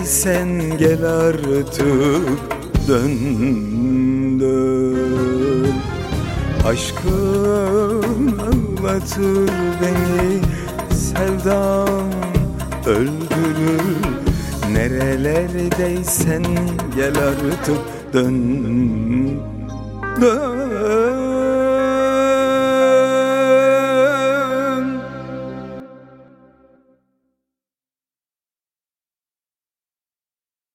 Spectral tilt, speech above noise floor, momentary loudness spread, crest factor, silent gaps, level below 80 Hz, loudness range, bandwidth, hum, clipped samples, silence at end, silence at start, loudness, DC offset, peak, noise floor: -6 dB/octave; over 73 dB; 7 LU; 16 dB; none; -32 dBFS; 4 LU; 16.5 kHz; none; under 0.1%; 4.7 s; 0 s; -18 LUFS; under 0.1%; -2 dBFS; under -90 dBFS